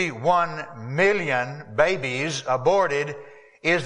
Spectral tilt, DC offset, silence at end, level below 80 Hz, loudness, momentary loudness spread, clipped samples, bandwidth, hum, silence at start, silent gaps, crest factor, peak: -4.5 dB/octave; under 0.1%; 0 s; -58 dBFS; -23 LUFS; 10 LU; under 0.1%; 10.5 kHz; none; 0 s; none; 18 dB; -4 dBFS